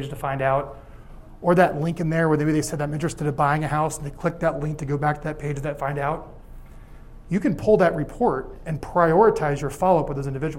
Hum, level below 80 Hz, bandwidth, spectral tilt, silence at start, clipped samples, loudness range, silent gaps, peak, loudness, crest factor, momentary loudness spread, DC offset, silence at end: none; -42 dBFS; 16 kHz; -7 dB/octave; 0 s; under 0.1%; 6 LU; none; -4 dBFS; -23 LUFS; 20 dB; 10 LU; under 0.1%; 0 s